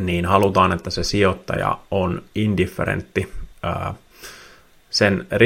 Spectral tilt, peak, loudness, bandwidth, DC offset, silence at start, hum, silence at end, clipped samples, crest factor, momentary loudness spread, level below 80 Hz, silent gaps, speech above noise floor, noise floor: -5.5 dB/octave; 0 dBFS; -21 LUFS; 16.5 kHz; under 0.1%; 0 s; none; 0 s; under 0.1%; 20 dB; 14 LU; -42 dBFS; none; 29 dB; -48 dBFS